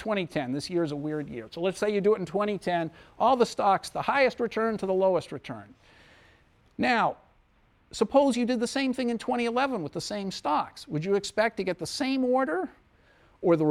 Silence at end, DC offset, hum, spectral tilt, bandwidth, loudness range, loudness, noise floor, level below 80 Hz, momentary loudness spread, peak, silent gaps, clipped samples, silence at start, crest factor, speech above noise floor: 0 s; under 0.1%; none; -5 dB/octave; 14 kHz; 3 LU; -27 LUFS; -63 dBFS; -62 dBFS; 9 LU; -10 dBFS; none; under 0.1%; 0 s; 18 dB; 36 dB